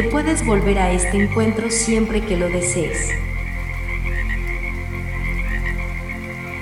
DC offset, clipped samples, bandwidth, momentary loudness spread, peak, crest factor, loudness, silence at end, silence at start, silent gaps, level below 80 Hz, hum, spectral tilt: under 0.1%; under 0.1%; 13.5 kHz; 9 LU; -4 dBFS; 16 dB; -21 LUFS; 0 s; 0 s; none; -26 dBFS; none; -5 dB/octave